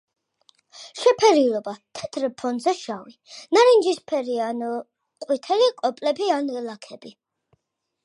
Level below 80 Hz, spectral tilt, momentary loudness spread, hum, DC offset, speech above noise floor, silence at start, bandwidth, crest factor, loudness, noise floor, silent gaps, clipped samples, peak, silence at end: -74 dBFS; -3 dB/octave; 23 LU; none; under 0.1%; 51 dB; 0.75 s; 11 kHz; 20 dB; -22 LUFS; -73 dBFS; none; under 0.1%; -4 dBFS; 0.95 s